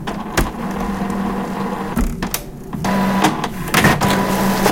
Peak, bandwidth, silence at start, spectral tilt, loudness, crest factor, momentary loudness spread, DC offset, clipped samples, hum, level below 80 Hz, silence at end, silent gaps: 0 dBFS; 17 kHz; 0 s; -4.5 dB/octave; -18 LUFS; 18 dB; 9 LU; under 0.1%; under 0.1%; none; -30 dBFS; 0 s; none